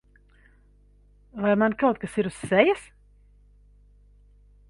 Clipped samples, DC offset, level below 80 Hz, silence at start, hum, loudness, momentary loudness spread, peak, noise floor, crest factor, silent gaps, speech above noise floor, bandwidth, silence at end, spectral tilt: under 0.1%; under 0.1%; -56 dBFS; 1.35 s; 50 Hz at -50 dBFS; -24 LUFS; 9 LU; -4 dBFS; -57 dBFS; 24 dB; none; 34 dB; 11.5 kHz; 1.85 s; -6 dB/octave